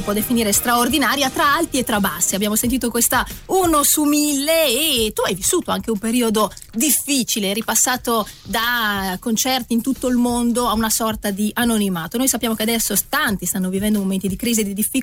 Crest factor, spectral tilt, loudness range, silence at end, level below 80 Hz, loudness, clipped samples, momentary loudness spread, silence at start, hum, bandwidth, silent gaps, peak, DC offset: 12 dB; -2.5 dB/octave; 2 LU; 0 s; -42 dBFS; -18 LUFS; under 0.1%; 6 LU; 0 s; none; 16.5 kHz; none; -6 dBFS; under 0.1%